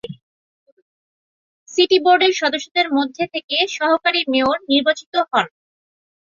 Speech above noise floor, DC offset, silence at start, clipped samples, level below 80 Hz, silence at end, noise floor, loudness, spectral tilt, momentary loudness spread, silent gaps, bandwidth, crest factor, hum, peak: over 73 dB; under 0.1%; 0.05 s; under 0.1%; -64 dBFS; 0.85 s; under -90 dBFS; -17 LUFS; -3 dB/octave; 8 LU; 0.22-0.66 s, 0.72-1.66 s, 2.71-2.75 s, 3.44-3.48 s, 5.06-5.12 s; 7.4 kHz; 18 dB; none; -2 dBFS